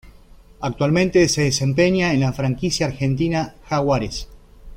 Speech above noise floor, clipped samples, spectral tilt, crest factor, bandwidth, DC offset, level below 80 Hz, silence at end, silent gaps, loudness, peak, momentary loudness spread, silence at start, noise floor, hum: 27 dB; under 0.1%; -5.5 dB/octave; 16 dB; 15.5 kHz; under 0.1%; -40 dBFS; 0 s; none; -20 LUFS; -4 dBFS; 9 LU; 0.05 s; -46 dBFS; none